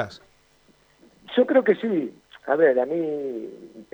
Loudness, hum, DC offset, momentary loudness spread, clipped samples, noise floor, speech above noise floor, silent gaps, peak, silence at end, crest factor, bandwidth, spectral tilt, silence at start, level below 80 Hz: -23 LUFS; none; under 0.1%; 18 LU; under 0.1%; -59 dBFS; 37 dB; none; -6 dBFS; 0.1 s; 18 dB; over 20 kHz; -7 dB/octave; 0 s; -70 dBFS